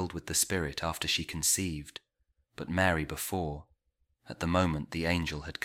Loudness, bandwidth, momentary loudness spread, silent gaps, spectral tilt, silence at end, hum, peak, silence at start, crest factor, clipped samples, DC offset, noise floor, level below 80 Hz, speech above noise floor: -31 LUFS; 16.5 kHz; 15 LU; none; -3.5 dB/octave; 0.15 s; none; -12 dBFS; 0 s; 20 dB; under 0.1%; under 0.1%; -77 dBFS; -50 dBFS; 45 dB